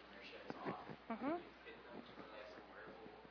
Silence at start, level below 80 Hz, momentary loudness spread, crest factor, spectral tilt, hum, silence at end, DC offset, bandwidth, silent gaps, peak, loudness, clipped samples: 0 s; -76 dBFS; 12 LU; 22 dB; -4 dB/octave; none; 0 s; under 0.1%; 5.4 kHz; none; -30 dBFS; -51 LUFS; under 0.1%